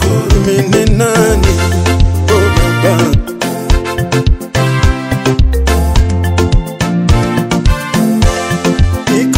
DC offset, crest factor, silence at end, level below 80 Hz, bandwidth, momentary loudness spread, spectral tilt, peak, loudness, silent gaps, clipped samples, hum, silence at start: under 0.1%; 10 dB; 0 s; -16 dBFS; 16.5 kHz; 4 LU; -5.5 dB/octave; 0 dBFS; -12 LUFS; none; 0.6%; none; 0 s